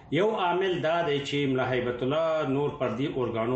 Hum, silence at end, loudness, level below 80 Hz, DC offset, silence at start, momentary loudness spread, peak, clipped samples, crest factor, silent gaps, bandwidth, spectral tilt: none; 0 s; -27 LUFS; -58 dBFS; under 0.1%; 0 s; 3 LU; -14 dBFS; under 0.1%; 14 dB; none; 8.4 kHz; -6.5 dB/octave